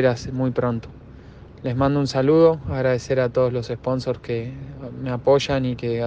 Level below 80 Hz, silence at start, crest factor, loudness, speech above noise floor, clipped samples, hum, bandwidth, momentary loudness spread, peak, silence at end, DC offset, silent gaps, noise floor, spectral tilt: -44 dBFS; 0 s; 16 dB; -22 LUFS; 21 dB; under 0.1%; none; 8.4 kHz; 14 LU; -6 dBFS; 0 s; under 0.1%; none; -42 dBFS; -7 dB/octave